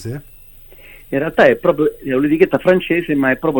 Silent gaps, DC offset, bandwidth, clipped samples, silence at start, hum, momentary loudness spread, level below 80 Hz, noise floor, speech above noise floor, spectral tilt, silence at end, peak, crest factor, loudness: none; under 0.1%; 17 kHz; under 0.1%; 0 s; none; 10 LU; -44 dBFS; -41 dBFS; 26 dB; -7.5 dB/octave; 0 s; 0 dBFS; 16 dB; -15 LUFS